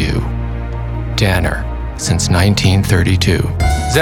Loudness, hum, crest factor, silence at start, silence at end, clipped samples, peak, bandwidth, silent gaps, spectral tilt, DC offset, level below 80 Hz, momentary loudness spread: -15 LUFS; none; 12 dB; 0 s; 0 s; under 0.1%; -2 dBFS; 17 kHz; none; -5 dB/octave; under 0.1%; -22 dBFS; 10 LU